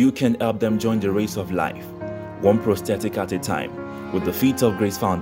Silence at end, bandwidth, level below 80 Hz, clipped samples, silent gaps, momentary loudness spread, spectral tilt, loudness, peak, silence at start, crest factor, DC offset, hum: 0 s; 16.5 kHz; -52 dBFS; under 0.1%; none; 12 LU; -6 dB/octave; -22 LUFS; -4 dBFS; 0 s; 18 dB; under 0.1%; none